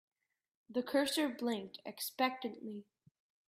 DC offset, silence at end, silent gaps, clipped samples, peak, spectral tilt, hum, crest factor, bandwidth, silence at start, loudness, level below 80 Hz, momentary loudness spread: under 0.1%; 0.65 s; none; under 0.1%; -20 dBFS; -3 dB/octave; none; 20 dB; 16 kHz; 0.7 s; -37 LUFS; -84 dBFS; 14 LU